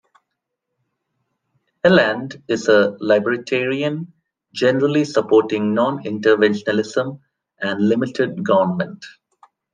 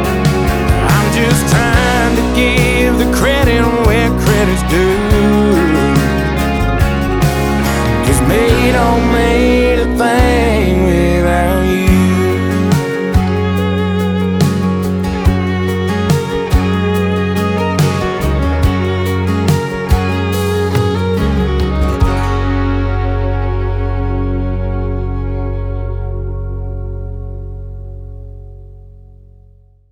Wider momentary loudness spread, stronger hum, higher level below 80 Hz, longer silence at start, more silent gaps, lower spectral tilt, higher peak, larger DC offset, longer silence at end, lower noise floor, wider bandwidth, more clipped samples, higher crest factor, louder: first, 12 LU vs 9 LU; neither; second, -64 dBFS vs -20 dBFS; first, 1.85 s vs 0 s; neither; about the same, -6 dB/octave vs -6 dB/octave; about the same, -2 dBFS vs 0 dBFS; neither; second, 0.65 s vs 0.8 s; first, -78 dBFS vs -44 dBFS; second, 9.4 kHz vs over 20 kHz; neither; first, 18 dB vs 12 dB; second, -18 LUFS vs -13 LUFS